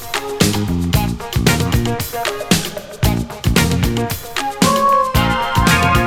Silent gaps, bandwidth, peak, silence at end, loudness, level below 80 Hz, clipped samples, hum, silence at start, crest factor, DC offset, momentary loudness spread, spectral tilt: none; 17.5 kHz; 0 dBFS; 0 s; -16 LUFS; -26 dBFS; under 0.1%; none; 0 s; 16 dB; under 0.1%; 8 LU; -4.5 dB/octave